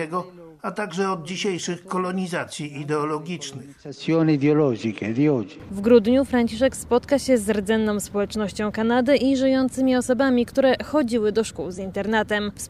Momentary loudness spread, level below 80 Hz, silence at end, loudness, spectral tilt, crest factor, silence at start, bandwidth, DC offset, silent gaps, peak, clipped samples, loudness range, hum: 12 LU; -50 dBFS; 0 s; -22 LUFS; -5.5 dB/octave; 18 dB; 0 s; 14.5 kHz; under 0.1%; none; -4 dBFS; under 0.1%; 6 LU; none